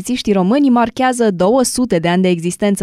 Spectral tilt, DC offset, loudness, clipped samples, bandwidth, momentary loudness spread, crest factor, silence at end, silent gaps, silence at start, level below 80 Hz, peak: -5.5 dB/octave; under 0.1%; -14 LUFS; under 0.1%; 14.5 kHz; 4 LU; 12 dB; 0 s; none; 0 s; -46 dBFS; -2 dBFS